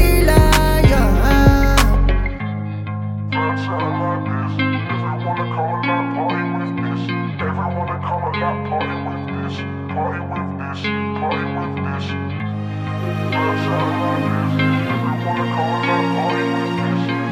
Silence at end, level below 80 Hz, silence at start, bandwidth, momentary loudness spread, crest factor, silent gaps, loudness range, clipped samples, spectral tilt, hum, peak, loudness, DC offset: 0 s; -24 dBFS; 0 s; 17 kHz; 11 LU; 18 dB; none; 6 LU; under 0.1%; -6 dB/octave; none; 0 dBFS; -19 LUFS; under 0.1%